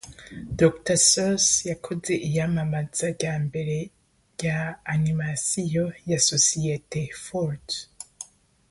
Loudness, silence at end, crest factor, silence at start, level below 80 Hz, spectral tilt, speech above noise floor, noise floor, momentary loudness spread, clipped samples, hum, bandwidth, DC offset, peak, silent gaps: -24 LUFS; 0.45 s; 22 dB; 0.05 s; -52 dBFS; -3.5 dB/octave; 21 dB; -46 dBFS; 21 LU; under 0.1%; none; 11.5 kHz; under 0.1%; -4 dBFS; none